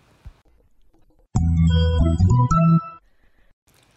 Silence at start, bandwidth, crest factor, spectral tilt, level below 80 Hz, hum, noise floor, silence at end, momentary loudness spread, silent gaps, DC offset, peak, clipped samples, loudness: 0.25 s; 8.2 kHz; 14 dB; -8 dB/octave; -30 dBFS; none; -57 dBFS; 1 s; 8 LU; none; under 0.1%; -8 dBFS; under 0.1%; -19 LUFS